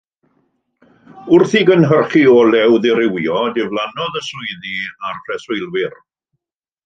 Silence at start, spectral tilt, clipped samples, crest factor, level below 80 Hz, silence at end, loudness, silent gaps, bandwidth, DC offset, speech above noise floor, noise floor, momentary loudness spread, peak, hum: 1.15 s; -6.5 dB/octave; under 0.1%; 16 dB; -60 dBFS; 0.9 s; -15 LUFS; none; 7.6 kHz; under 0.1%; 65 dB; -79 dBFS; 14 LU; 0 dBFS; none